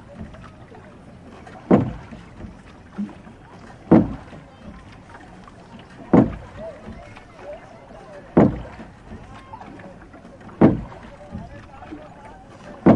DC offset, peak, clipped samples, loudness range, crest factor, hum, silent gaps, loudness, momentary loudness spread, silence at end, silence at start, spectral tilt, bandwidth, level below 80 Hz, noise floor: under 0.1%; 0 dBFS; under 0.1%; 4 LU; 24 dB; none; none; -20 LUFS; 26 LU; 0 s; 0.2 s; -9.5 dB/octave; 8.8 kHz; -44 dBFS; -43 dBFS